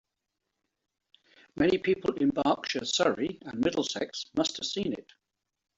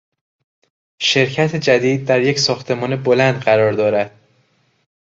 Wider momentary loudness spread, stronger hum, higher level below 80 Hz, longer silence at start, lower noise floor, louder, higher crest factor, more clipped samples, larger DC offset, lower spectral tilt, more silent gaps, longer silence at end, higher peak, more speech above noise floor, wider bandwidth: about the same, 8 LU vs 6 LU; neither; second, -64 dBFS vs -58 dBFS; first, 1.55 s vs 1 s; first, -85 dBFS vs -60 dBFS; second, -29 LUFS vs -16 LUFS; about the same, 18 dB vs 16 dB; neither; neither; about the same, -4 dB/octave vs -4.5 dB/octave; neither; second, 0.75 s vs 1.05 s; second, -12 dBFS vs 0 dBFS; first, 56 dB vs 45 dB; about the same, 8 kHz vs 7.8 kHz